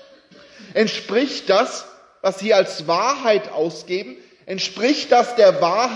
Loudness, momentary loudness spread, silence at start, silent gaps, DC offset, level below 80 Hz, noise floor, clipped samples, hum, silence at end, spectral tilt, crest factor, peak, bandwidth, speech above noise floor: -19 LUFS; 12 LU; 0.6 s; none; under 0.1%; -72 dBFS; -47 dBFS; under 0.1%; none; 0 s; -3.5 dB/octave; 16 dB; -2 dBFS; 10.5 kHz; 29 dB